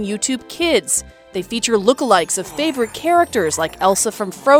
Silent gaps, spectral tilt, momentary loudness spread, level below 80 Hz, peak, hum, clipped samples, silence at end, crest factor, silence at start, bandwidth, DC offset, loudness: none; -2.5 dB/octave; 6 LU; -50 dBFS; 0 dBFS; none; under 0.1%; 0 s; 18 dB; 0 s; 19 kHz; under 0.1%; -17 LUFS